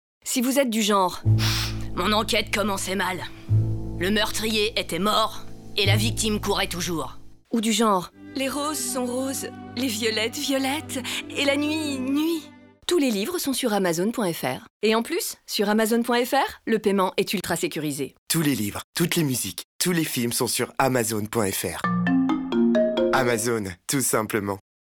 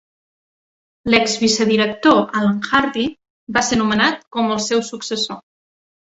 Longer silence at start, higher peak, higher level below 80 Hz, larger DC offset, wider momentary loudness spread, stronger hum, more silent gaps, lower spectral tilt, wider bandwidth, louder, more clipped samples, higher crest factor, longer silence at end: second, 0.25 s vs 1.05 s; second, -8 dBFS vs -2 dBFS; first, -46 dBFS vs -52 dBFS; neither; about the same, 7 LU vs 9 LU; neither; first, 14.70-14.80 s, 18.18-18.27 s, 18.84-18.93 s, 19.64-19.79 s vs 3.30-3.47 s, 4.27-4.31 s; about the same, -4 dB/octave vs -3.5 dB/octave; first, over 20 kHz vs 8.2 kHz; second, -24 LUFS vs -17 LUFS; neither; about the same, 16 dB vs 18 dB; second, 0.35 s vs 0.75 s